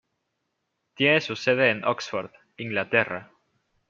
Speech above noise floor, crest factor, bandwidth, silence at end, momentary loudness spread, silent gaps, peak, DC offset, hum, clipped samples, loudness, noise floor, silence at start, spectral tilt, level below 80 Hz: 54 dB; 22 dB; 7.6 kHz; 0.65 s; 14 LU; none; -4 dBFS; under 0.1%; none; under 0.1%; -24 LUFS; -78 dBFS; 1 s; -5 dB/octave; -72 dBFS